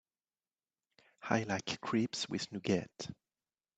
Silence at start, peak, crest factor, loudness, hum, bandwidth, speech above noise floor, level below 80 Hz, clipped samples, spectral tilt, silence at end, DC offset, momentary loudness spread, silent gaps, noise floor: 1.2 s; -14 dBFS; 26 dB; -36 LUFS; none; 9 kHz; over 54 dB; -74 dBFS; under 0.1%; -4.5 dB/octave; 0.65 s; under 0.1%; 13 LU; none; under -90 dBFS